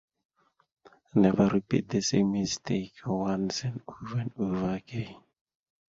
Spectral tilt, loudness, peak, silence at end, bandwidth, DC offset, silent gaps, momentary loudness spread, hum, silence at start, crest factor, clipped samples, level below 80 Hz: -6 dB/octave; -29 LUFS; -8 dBFS; 0.75 s; 7.8 kHz; under 0.1%; none; 12 LU; none; 1.15 s; 22 dB; under 0.1%; -58 dBFS